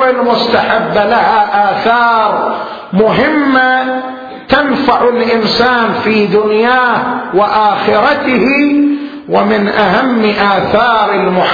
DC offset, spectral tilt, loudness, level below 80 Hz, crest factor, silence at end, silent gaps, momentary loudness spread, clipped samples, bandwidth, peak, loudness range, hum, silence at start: under 0.1%; -6.5 dB/octave; -10 LUFS; -44 dBFS; 10 dB; 0 s; none; 5 LU; under 0.1%; 5.4 kHz; 0 dBFS; 1 LU; none; 0 s